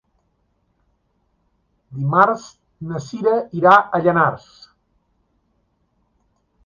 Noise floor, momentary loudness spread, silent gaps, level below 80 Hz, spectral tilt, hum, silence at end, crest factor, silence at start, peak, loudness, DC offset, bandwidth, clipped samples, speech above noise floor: -66 dBFS; 19 LU; none; -60 dBFS; -7 dB/octave; none; 2.3 s; 20 dB; 1.9 s; 0 dBFS; -17 LUFS; under 0.1%; 7.4 kHz; under 0.1%; 49 dB